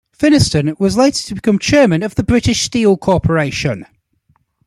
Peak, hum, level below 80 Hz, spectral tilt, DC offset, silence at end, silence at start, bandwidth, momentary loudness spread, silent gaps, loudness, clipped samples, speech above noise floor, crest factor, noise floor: 0 dBFS; none; -36 dBFS; -5 dB/octave; under 0.1%; 0.85 s; 0.2 s; 14 kHz; 7 LU; none; -14 LUFS; under 0.1%; 46 dB; 14 dB; -59 dBFS